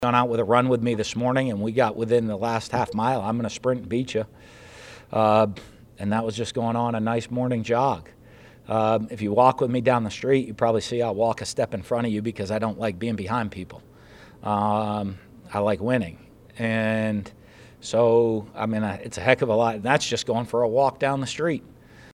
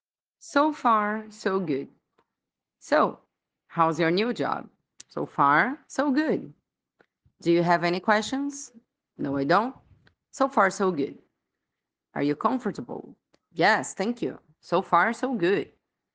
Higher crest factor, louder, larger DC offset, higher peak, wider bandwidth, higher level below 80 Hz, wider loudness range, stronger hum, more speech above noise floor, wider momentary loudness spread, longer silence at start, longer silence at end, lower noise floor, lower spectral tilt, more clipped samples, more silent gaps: about the same, 24 dB vs 22 dB; about the same, -24 LUFS vs -25 LUFS; neither; first, 0 dBFS vs -6 dBFS; first, 13 kHz vs 9.8 kHz; first, -56 dBFS vs -72 dBFS; about the same, 5 LU vs 3 LU; neither; second, 26 dB vs 62 dB; second, 10 LU vs 13 LU; second, 0 s vs 0.45 s; second, 0.05 s vs 0.5 s; second, -49 dBFS vs -87 dBFS; about the same, -6 dB/octave vs -5 dB/octave; neither; neither